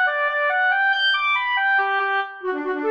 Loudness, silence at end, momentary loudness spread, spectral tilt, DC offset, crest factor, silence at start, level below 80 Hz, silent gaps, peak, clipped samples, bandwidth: -20 LUFS; 0 s; 7 LU; -1.5 dB/octave; under 0.1%; 12 dB; 0 s; -72 dBFS; none; -10 dBFS; under 0.1%; 8.2 kHz